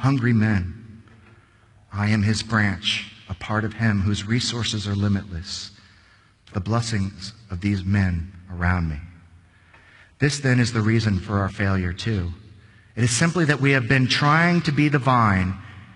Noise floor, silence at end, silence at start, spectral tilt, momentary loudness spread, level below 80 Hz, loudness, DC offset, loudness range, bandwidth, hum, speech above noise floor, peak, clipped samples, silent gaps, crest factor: -55 dBFS; 0.05 s; 0 s; -5.5 dB/octave; 15 LU; -44 dBFS; -22 LUFS; under 0.1%; 7 LU; 11 kHz; none; 34 dB; -4 dBFS; under 0.1%; none; 18 dB